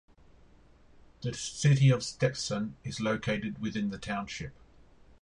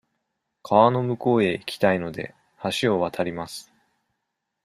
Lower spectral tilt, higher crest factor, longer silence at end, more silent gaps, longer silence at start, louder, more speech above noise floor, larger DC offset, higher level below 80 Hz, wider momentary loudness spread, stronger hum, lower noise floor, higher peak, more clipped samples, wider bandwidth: about the same, -5.5 dB/octave vs -6 dB/octave; about the same, 18 dB vs 22 dB; second, 0.7 s vs 1.05 s; neither; first, 1.2 s vs 0.65 s; second, -31 LUFS vs -23 LUFS; second, 28 dB vs 57 dB; neither; about the same, -58 dBFS vs -62 dBFS; about the same, 15 LU vs 17 LU; neither; second, -58 dBFS vs -80 dBFS; second, -14 dBFS vs -2 dBFS; neither; second, 10.5 kHz vs 15 kHz